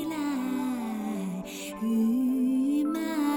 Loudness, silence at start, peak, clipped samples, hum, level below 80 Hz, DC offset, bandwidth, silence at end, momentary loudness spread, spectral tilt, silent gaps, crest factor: -29 LUFS; 0 s; -18 dBFS; under 0.1%; none; -66 dBFS; under 0.1%; 17.5 kHz; 0 s; 8 LU; -5.5 dB/octave; none; 10 dB